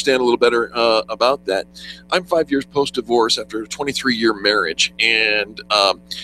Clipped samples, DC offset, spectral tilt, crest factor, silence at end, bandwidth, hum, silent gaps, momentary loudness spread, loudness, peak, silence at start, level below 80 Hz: under 0.1%; under 0.1%; -2.5 dB/octave; 18 dB; 0 s; 14.5 kHz; none; none; 8 LU; -17 LUFS; 0 dBFS; 0 s; -52 dBFS